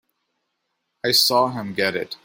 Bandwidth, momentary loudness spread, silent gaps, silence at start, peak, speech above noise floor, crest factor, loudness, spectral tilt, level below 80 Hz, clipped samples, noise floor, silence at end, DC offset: 16.5 kHz; 8 LU; none; 1.05 s; -4 dBFS; 55 dB; 20 dB; -19 LUFS; -2.5 dB/octave; -64 dBFS; under 0.1%; -76 dBFS; 0.1 s; under 0.1%